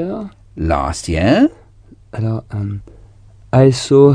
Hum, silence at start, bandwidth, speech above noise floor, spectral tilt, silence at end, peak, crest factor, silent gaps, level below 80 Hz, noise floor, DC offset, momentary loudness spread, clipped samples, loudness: none; 0 s; 10 kHz; 30 dB; -7 dB/octave; 0 s; 0 dBFS; 16 dB; none; -34 dBFS; -44 dBFS; under 0.1%; 16 LU; under 0.1%; -16 LUFS